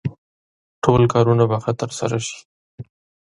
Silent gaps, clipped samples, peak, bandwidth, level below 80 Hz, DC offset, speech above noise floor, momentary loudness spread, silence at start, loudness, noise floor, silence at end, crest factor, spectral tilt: 0.18-0.82 s, 2.45-2.78 s; under 0.1%; 0 dBFS; 11.5 kHz; -48 dBFS; under 0.1%; over 72 dB; 15 LU; 0.05 s; -19 LUFS; under -90 dBFS; 0.4 s; 20 dB; -6.5 dB/octave